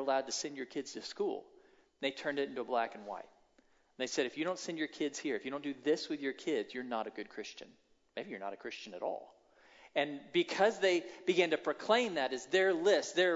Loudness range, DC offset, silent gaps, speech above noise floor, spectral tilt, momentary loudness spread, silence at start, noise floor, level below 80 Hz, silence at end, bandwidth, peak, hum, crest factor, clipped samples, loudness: 9 LU; under 0.1%; none; 35 dB; -1.5 dB/octave; 14 LU; 0 s; -70 dBFS; -82 dBFS; 0 s; 7.6 kHz; -16 dBFS; none; 20 dB; under 0.1%; -35 LUFS